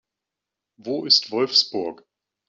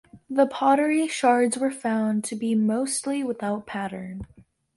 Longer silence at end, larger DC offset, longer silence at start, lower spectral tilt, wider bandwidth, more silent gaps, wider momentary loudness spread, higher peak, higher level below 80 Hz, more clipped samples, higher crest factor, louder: about the same, 0.55 s vs 0.5 s; neither; first, 0.85 s vs 0.15 s; second, -2.5 dB/octave vs -4.5 dB/octave; second, 7.6 kHz vs 11.5 kHz; neither; first, 15 LU vs 12 LU; first, -4 dBFS vs -8 dBFS; second, -74 dBFS vs -58 dBFS; neither; about the same, 20 dB vs 16 dB; first, -19 LUFS vs -24 LUFS